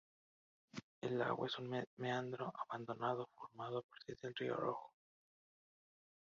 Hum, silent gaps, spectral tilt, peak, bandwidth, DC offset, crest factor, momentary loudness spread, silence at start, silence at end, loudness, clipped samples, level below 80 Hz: none; 0.83-1.01 s, 1.87-1.97 s, 3.83-3.89 s; -4 dB/octave; -24 dBFS; 7.2 kHz; under 0.1%; 22 dB; 13 LU; 0.75 s; 1.45 s; -44 LUFS; under 0.1%; -84 dBFS